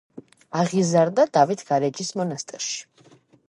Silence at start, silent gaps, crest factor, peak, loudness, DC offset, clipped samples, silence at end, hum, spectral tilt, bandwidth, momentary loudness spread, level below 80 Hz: 0.15 s; none; 20 dB; -4 dBFS; -23 LUFS; under 0.1%; under 0.1%; 0.65 s; none; -5 dB/octave; 11.5 kHz; 10 LU; -74 dBFS